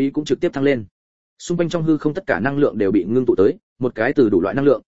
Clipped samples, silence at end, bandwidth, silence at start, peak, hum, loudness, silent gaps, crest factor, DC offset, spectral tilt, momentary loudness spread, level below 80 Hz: under 0.1%; 0.1 s; 8 kHz; 0 s; -2 dBFS; none; -19 LUFS; 0.91-1.37 s, 3.63-3.76 s; 16 dB; 0.9%; -7 dB/octave; 8 LU; -50 dBFS